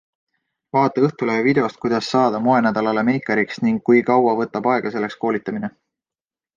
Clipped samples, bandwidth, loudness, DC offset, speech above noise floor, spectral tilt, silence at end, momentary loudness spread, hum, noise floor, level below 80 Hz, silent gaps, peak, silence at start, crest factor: under 0.1%; 7.4 kHz; -19 LUFS; under 0.1%; over 72 dB; -7 dB/octave; 0.85 s; 7 LU; none; under -90 dBFS; -62 dBFS; none; -4 dBFS; 0.75 s; 16 dB